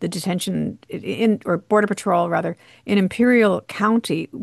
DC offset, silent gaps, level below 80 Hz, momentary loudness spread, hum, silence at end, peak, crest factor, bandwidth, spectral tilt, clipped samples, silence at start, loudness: under 0.1%; none; -62 dBFS; 12 LU; none; 0 s; -4 dBFS; 16 dB; 12.5 kHz; -6 dB/octave; under 0.1%; 0 s; -20 LUFS